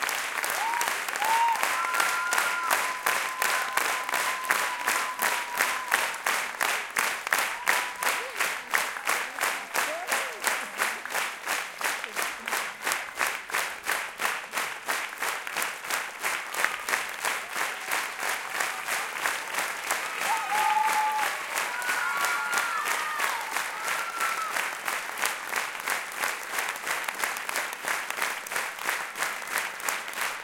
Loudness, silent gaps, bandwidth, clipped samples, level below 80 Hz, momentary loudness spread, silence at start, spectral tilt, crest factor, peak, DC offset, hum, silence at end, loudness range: -28 LUFS; none; 17 kHz; under 0.1%; -72 dBFS; 5 LU; 0 s; 1 dB/octave; 26 dB; -4 dBFS; under 0.1%; none; 0 s; 4 LU